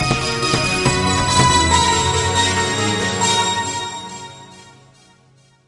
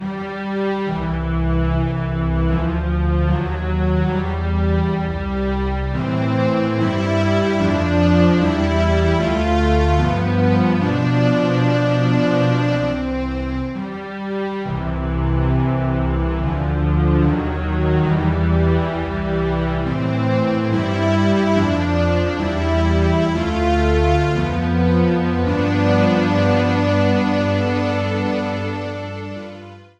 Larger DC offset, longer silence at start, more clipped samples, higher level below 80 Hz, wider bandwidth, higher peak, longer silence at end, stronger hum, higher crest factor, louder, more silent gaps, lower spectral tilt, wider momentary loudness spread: second, under 0.1% vs 0.1%; about the same, 0 s vs 0 s; neither; second, -38 dBFS vs -26 dBFS; first, 11.5 kHz vs 8.4 kHz; first, 0 dBFS vs -4 dBFS; first, 0.95 s vs 0.15 s; neither; about the same, 18 dB vs 14 dB; first, -16 LUFS vs -19 LUFS; neither; second, -3 dB/octave vs -8 dB/octave; first, 13 LU vs 7 LU